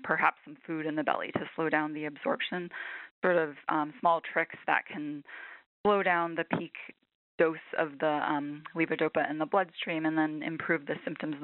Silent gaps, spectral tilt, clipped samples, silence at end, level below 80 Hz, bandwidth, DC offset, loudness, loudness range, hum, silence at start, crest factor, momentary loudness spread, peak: 3.11-3.22 s, 5.66-5.84 s, 7.15-7.38 s; -3.5 dB/octave; under 0.1%; 0 s; -76 dBFS; 4.2 kHz; under 0.1%; -31 LUFS; 1 LU; none; 0 s; 22 dB; 11 LU; -10 dBFS